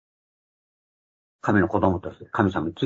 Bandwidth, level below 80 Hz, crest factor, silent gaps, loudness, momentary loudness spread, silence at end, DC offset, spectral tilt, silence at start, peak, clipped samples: 7.6 kHz; -56 dBFS; 22 dB; none; -24 LUFS; 10 LU; 0 s; under 0.1%; -8 dB/octave; 1.45 s; -4 dBFS; under 0.1%